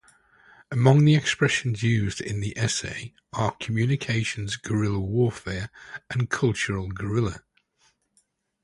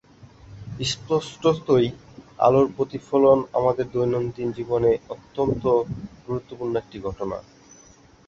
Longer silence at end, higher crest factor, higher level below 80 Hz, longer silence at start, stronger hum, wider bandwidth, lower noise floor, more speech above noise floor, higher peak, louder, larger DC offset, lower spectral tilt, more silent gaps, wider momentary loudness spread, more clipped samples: first, 1.25 s vs 0.9 s; about the same, 22 dB vs 18 dB; about the same, -48 dBFS vs -50 dBFS; first, 0.7 s vs 0.5 s; neither; first, 11.5 kHz vs 8 kHz; first, -69 dBFS vs -52 dBFS; first, 45 dB vs 29 dB; about the same, -4 dBFS vs -4 dBFS; about the same, -25 LUFS vs -23 LUFS; neither; about the same, -5.5 dB/octave vs -6.5 dB/octave; neither; about the same, 13 LU vs 14 LU; neither